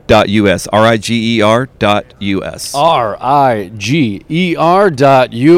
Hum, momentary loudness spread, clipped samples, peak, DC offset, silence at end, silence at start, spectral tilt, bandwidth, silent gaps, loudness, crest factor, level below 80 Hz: none; 8 LU; 0.6%; 0 dBFS; under 0.1%; 0 s; 0.1 s; -5.5 dB/octave; 16 kHz; none; -11 LUFS; 10 dB; -40 dBFS